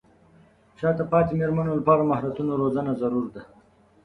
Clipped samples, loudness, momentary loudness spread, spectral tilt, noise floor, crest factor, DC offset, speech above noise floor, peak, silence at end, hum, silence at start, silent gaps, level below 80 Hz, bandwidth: under 0.1%; -24 LUFS; 8 LU; -10.5 dB/octave; -56 dBFS; 20 dB; under 0.1%; 33 dB; -6 dBFS; 0.6 s; none; 0.8 s; none; -54 dBFS; 4.6 kHz